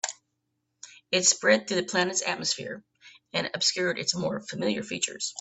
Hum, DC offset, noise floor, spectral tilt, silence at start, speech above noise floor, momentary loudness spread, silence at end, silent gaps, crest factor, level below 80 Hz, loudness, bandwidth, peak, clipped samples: none; under 0.1%; -79 dBFS; -2 dB/octave; 0.05 s; 51 dB; 10 LU; 0 s; none; 22 dB; -70 dBFS; -26 LUFS; 8.6 kHz; -6 dBFS; under 0.1%